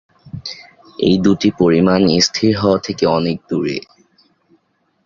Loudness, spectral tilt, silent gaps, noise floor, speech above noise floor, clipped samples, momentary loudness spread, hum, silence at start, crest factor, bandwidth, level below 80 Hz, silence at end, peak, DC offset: -15 LUFS; -5.5 dB/octave; none; -62 dBFS; 48 dB; under 0.1%; 18 LU; none; 0.25 s; 16 dB; 7.6 kHz; -46 dBFS; 1.25 s; -2 dBFS; under 0.1%